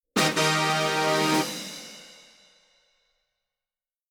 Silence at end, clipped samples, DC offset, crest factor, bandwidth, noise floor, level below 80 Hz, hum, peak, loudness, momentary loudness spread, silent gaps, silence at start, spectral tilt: 2 s; under 0.1%; under 0.1%; 20 dB; over 20 kHz; under -90 dBFS; -74 dBFS; none; -8 dBFS; -23 LUFS; 18 LU; none; 0.15 s; -3 dB/octave